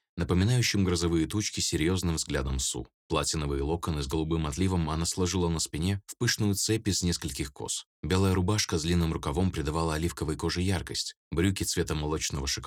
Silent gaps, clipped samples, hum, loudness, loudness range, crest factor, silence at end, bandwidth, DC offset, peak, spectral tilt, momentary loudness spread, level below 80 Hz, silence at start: 2.94-3.09 s, 7.86-8.03 s, 11.17-11.31 s; under 0.1%; none; -29 LUFS; 2 LU; 18 dB; 0 s; 17.5 kHz; under 0.1%; -12 dBFS; -4.5 dB/octave; 6 LU; -42 dBFS; 0.15 s